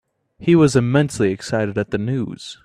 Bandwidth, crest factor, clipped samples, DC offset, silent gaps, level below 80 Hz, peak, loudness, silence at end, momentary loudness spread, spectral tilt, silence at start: 12.5 kHz; 18 dB; under 0.1%; under 0.1%; none; -50 dBFS; -2 dBFS; -18 LUFS; 0.1 s; 11 LU; -6.5 dB/octave; 0.4 s